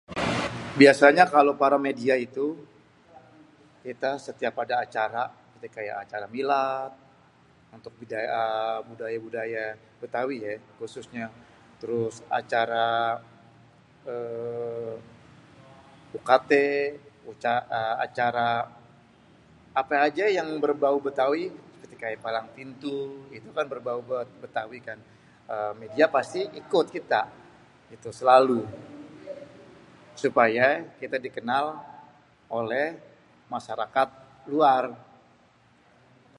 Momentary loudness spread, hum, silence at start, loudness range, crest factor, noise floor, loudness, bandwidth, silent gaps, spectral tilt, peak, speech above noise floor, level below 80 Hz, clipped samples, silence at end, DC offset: 20 LU; none; 0.1 s; 8 LU; 26 dB; -60 dBFS; -26 LUFS; 11.5 kHz; none; -5 dB/octave; -2 dBFS; 34 dB; -66 dBFS; under 0.1%; 1.4 s; under 0.1%